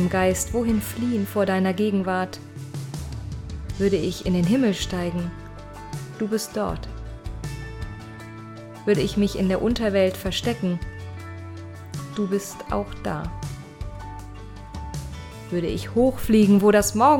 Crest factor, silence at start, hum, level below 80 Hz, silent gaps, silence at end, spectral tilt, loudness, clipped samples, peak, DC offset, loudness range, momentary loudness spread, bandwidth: 18 dB; 0 s; none; -40 dBFS; none; 0 s; -5.5 dB/octave; -24 LUFS; under 0.1%; -4 dBFS; under 0.1%; 7 LU; 18 LU; 17 kHz